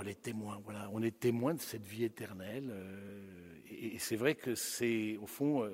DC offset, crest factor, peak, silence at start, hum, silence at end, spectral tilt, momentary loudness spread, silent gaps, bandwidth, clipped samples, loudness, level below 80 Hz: under 0.1%; 20 dB; -18 dBFS; 0 s; none; 0 s; -5 dB/octave; 15 LU; none; 16 kHz; under 0.1%; -38 LUFS; -76 dBFS